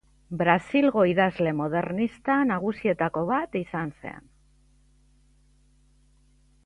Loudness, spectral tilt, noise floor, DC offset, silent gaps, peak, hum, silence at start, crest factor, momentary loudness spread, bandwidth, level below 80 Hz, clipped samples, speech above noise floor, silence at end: -25 LUFS; -8 dB/octave; -61 dBFS; under 0.1%; none; -6 dBFS; none; 0.3 s; 22 dB; 13 LU; 10.5 kHz; -58 dBFS; under 0.1%; 36 dB; 2.45 s